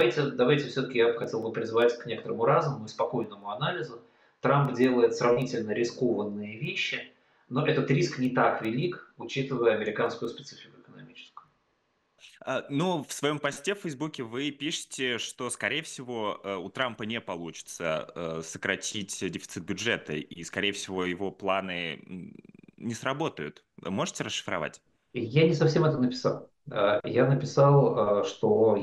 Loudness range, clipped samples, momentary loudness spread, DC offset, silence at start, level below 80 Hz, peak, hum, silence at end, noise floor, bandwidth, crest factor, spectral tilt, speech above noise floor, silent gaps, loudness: 7 LU; under 0.1%; 13 LU; under 0.1%; 0 s; -68 dBFS; -10 dBFS; none; 0 s; -73 dBFS; 12.5 kHz; 18 dB; -5.5 dB/octave; 45 dB; none; -29 LUFS